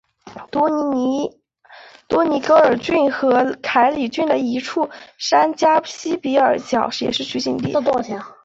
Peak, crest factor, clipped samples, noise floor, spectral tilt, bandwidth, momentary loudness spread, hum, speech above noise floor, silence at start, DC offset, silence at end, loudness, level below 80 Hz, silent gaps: -2 dBFS; 16 dB; under 0.1%; -45 dBFS; -4.5 dB/octave; 8 kHz; 9 LU; none; 28 dB; 0.25 s; under 0.1%; 0.15 s; -18 LUFS; -58 dBFS; none